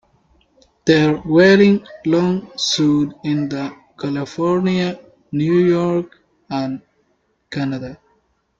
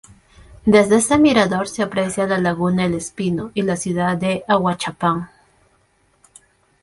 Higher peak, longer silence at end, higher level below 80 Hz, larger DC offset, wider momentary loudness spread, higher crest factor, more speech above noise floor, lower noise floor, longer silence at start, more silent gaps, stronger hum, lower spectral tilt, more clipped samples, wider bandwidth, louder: about the same, -2 dBFS vs -2 dBFS; second, 0.65 s vs 1.55 s; second, -54 dBFS vs -48 dBFS; neither; first, 16 LU vs 9 LU; about the same, 16 dB vs 18 dB; first, 48 dB vs 43 dB; first, -64 dBFS vs -60 dBFS; first, 0.85 s vs 0.5 s; neither; neither; about the same, -6 dB/octave vs -5 dB/octave; neither; second, 7.8 kHz vs 11.5 kHz; about the same, -17 LUFS vs -18 LUFS